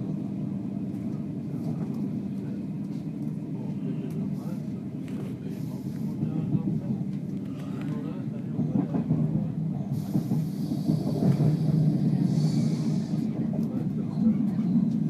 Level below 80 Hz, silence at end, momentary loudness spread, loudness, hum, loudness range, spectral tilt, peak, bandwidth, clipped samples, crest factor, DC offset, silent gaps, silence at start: -58 dBFS; 0 s; 9 LU; -29 LUFS; none; 7 LU; -9 dB/octave; -12 dBFS; 13 kHz; under 0.1%; 16 dB; under 0.1%; none; 0 s